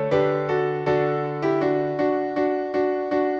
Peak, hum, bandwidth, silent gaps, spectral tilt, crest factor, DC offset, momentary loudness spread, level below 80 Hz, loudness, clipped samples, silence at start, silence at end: -8 dBFS; none; 6.8 kHz; none; -8 dB/octave; 14 dB; under 0.1%; 2 LU; -58 dBFS; -23 LUFS; under 0.1%; 0 s; 0 s